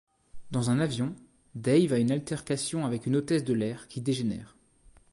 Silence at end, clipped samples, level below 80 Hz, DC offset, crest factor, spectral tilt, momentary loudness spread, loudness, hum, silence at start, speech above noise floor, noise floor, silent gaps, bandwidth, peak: 0.65 s; under 0.1%; -60 dBFS; under 0.1%; 16 dB; -6 dB/octave; 10 LU; -29 LUFS; none; 0.35 s; 31 dB; -59 dBFS; none; 11.5 kHz; -12 dBFS